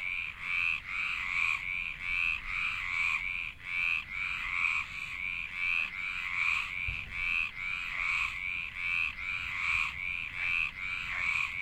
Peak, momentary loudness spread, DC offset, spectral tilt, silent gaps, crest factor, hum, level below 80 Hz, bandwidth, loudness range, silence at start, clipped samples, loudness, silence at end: -16 dBFS; 5 LU; under 0.1%; -1.5 dB/octave; none; 18 dB; none; -52 dBFS; 16 kHz; 1 LU; 0 s; under 0.1%; -31 LUFS; 0 s